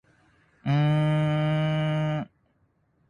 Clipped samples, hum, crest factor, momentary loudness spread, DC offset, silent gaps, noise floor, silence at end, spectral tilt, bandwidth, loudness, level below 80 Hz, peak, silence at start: under 0.1%; none; 12 dB; 11 LU; under 0.1%; none; -68 dBFS; 0.85 s; -8.5 dB/octave; 9.6 kHz; -25 LUFS; -58 dBFS; -14 dBFS; 0.65 s